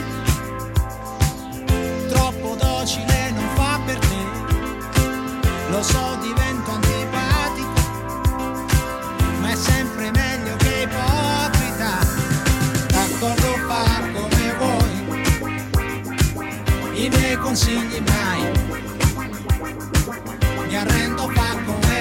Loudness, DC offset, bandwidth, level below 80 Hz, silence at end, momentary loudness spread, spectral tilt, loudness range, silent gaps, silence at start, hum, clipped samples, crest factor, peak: -21 LUFS; under 0.1%; 17 kHz; -28 dBFS; 0 s; 5 LU; -4.5 dB/octave; 2 LU; none; 0 s; none; under 0.1%; 16 dB; -4 dBFS